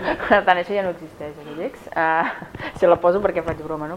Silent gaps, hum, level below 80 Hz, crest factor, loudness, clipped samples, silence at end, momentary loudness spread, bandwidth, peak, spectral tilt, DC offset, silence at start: none; none; -48 dBFS; 20 dB; -20 LUFS; under 0.1%; 0 s; 16 LU; 12 kHz; 0 dBFS; -6.5 dB/octave; under 0.1%; 0 s